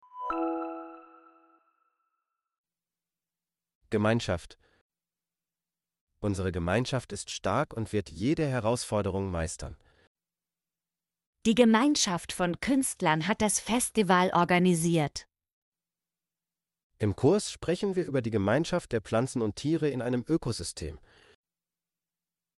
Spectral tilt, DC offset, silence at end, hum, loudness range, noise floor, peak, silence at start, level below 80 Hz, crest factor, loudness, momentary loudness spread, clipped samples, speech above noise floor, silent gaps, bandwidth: -5 dB/octave; under 0.1%; 1.6 s; none; 9 LU; under -90 dBFS; -8 dBFS; 0.15 s; -54 dBFS; 22 dB; -28 LUFS; 12 LU; under 0.1%; over 62 dB; 2.58-2.64 s, 3.75-3.81 s, 4.81-4.90 s, 6.01-6.07 s, 10.07-10.15 s, 11.27-11.33 s, 15.53-15.72 s, 16.83-16.90 s; 11.5 kHz